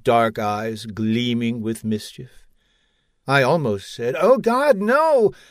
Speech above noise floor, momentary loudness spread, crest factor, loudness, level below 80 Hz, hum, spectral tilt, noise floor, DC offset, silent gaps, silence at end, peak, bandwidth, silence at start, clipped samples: 46 dB; 10 LU; 18 dB; -20 LUFS; -58 dBFS; none; -6 dB/octave; -65 dBFS; under 0.1%; none; 0.2 s; -2 dBFS; 15.5 kHz; 0.05 s; under 0.1%